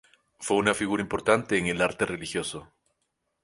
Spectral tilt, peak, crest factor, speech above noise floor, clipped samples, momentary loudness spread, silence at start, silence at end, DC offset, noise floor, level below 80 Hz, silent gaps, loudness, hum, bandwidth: -4 dB/octave; -6 dBFS; 22 dB; 52 dB; under 0.1%; 11 LU; 0.4 s; 0.8 s; under 0.1%; -78 dBFS; -56 dBFS; none; -26 LUFS; none; 11.5 kHz